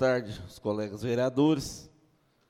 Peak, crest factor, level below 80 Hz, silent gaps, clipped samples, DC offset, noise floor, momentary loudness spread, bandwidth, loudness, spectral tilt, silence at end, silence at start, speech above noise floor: -12 dBFS; 16 dB; -58 dBFS; none; under 0.1%; under 0.1%; -67 dBFS; 15 LU; 15.5 kHz; -29 LUFS; -6 dB/octave; 0.6 s; 0 s; 38 dB